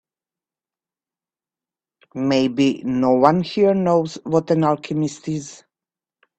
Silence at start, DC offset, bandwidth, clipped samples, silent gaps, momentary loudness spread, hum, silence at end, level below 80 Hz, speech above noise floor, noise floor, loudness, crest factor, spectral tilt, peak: 2.15 s; under 0.1%; 8.6 kHz; under 0.1%; none; 12 LU; none; 0.85 s; -60 dBFS; over 72 dB; under -90 dBFS; -19 LUFS; 20 dB; -6.5 dB/octave; 0 dBFS